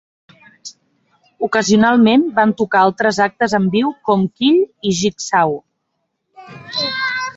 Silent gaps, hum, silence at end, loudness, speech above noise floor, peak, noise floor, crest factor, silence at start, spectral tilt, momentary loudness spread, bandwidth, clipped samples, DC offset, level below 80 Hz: none; none; 0.05 s; -15 LUFS; 57 dB; -2 dBFS; -72 dBFS; 16 dB; 0.65 s; -4.5 dB/octave; 13 LU; 8 kHz; under 0.1%; under 0.1%; -56 dBFS